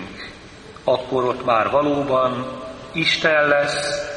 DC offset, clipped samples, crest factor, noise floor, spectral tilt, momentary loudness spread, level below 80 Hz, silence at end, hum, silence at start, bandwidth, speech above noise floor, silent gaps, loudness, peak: under 0.1%; under 0.1%; 18 dB; -40 dBFS; -4 dB/octave; 18 LU; -50 dBFS; 0 s; none; 0 s; 10.5 kHz; 21 dB; none; -19 LUFS; -4 dBFS